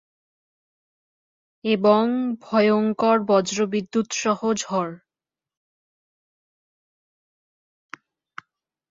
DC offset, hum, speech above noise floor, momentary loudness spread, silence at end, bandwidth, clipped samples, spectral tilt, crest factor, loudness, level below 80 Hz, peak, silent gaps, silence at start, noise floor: under 0.1%; none; over 69 dB; 8 LU; 3.95 s; 7.8 kHz; under 0.1%; -4.5 dB/octave; 20 dB; -21 LUFS; -70 dBFS; -4 dBFS; none; 1.65 s; under -90 dBFS